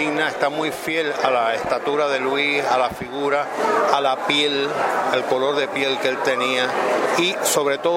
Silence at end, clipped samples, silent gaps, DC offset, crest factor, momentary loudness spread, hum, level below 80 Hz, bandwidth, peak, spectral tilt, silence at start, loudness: 0 s; under 0.1%; none; under 0.1%; 18 dB; 4 LU; none; -60 dBFS; 16.5 kHz; -2 dBFS; -2.5 dB/octave; 0 s; -20 LUFS